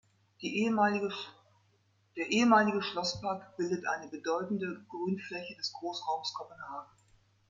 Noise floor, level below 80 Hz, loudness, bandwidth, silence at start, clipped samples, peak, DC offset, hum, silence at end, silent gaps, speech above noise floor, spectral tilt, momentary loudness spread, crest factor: -71 dBFS; -74 dBFS; -32 LUFS; 7.6 kHz; 0.4 s; under 0.1%; -12 dBFS; under 0.1%; none; 0.65 s; none; 38 dB; -4.5 dB/octave; 17 LU; 22 dB